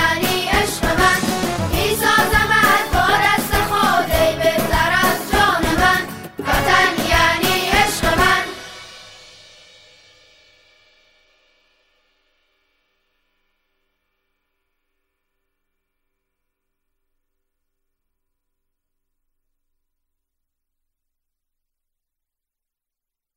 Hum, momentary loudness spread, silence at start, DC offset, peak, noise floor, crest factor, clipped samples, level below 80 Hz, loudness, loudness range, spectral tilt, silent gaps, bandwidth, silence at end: none; 6 LU; 0 s; under 0.1%; -2 dBFS; -86 dBFS; 20 dB; under 0.1%; -34 dBFS; -16 LUFS; 5 LU; -3.5 dB/octave; none; 16.5 kHz; 14.2 s